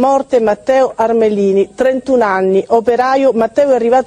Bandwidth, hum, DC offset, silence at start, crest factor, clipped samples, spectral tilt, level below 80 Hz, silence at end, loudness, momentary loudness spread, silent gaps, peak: 9.8 kHz; none; under 0.1%; 0 s; 12 dB; under 0.1%; -6 dB/octave; -50 dBFS; 0 s; -12 LUFS; 2 LU; none; 0 dBFS